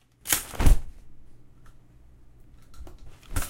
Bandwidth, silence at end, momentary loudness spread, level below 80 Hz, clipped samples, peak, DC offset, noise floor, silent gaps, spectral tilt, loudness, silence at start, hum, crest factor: 16.5 kHz; 0 s; 25 LU; -30 dBFS; under 0.1%; -4 dBFS; under 0.1%; -51 dBFS; none; -3.5 dB/octave; -26 LUFS; 0.25 s; none; 22 dB